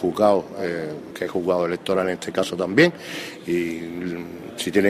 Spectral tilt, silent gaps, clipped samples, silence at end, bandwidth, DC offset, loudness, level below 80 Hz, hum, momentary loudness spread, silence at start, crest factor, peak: -5.5 dB/octave; none; under 0.1%; 0 s; 15.5 kHz; under 0.1%; -23 LUFS; -60 dBFS; none; 14 LU; 0 s; 18 dB; -4 dBFS